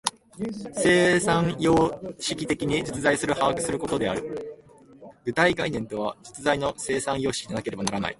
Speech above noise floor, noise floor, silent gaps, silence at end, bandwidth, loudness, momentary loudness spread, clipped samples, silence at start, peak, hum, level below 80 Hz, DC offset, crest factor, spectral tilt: 26 dB; -50 dBFS; none; 0.05 s; 11.5 kHz; -25 LUFS; 11 LU; under 0.1%; 0.05 s; -2 dBFS; none; -52 dBFS; under 0.1%; 22 dB; -4.5 dB/octave